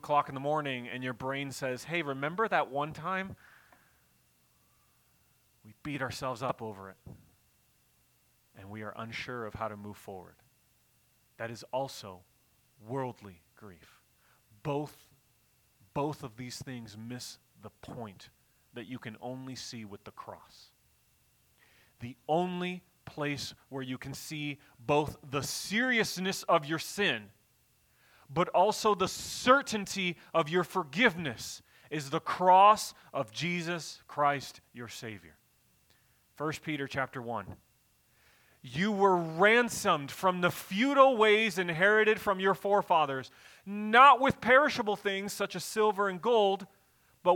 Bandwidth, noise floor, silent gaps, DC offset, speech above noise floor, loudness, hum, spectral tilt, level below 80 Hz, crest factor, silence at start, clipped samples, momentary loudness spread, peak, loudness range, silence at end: 19 kHz; -69 dBFS; none; under 0.1%; 39 dB; -30 LUFS; none; -4 dB/octave; -68 dBFS; 24 dB; 0.05 s; under 0.1%; 21 LU; -8 dBFS; 17 LU; 0 s